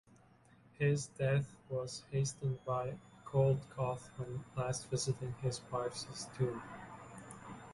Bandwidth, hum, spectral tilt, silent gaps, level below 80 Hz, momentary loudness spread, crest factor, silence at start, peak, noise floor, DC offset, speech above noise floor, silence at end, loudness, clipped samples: 11.5 kHz; none; -5.5 dB/octave; none; -64 dBFS; 17 LU; 18 dB; 0.8 s; -22 dBFS; -65 dBFS; under 0.1%; 28 dB; 0 s; -38 LUFS; under 0.1%